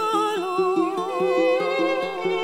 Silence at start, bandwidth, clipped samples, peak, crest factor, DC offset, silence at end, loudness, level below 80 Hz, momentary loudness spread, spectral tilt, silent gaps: 0 s; 16 kHz; under 0.1%; -10 dBFS; 14 dB; under 0.1%; 0 s; -22 LUFS; -72 dBFS; 4 LU; -4.5 dB/octave; none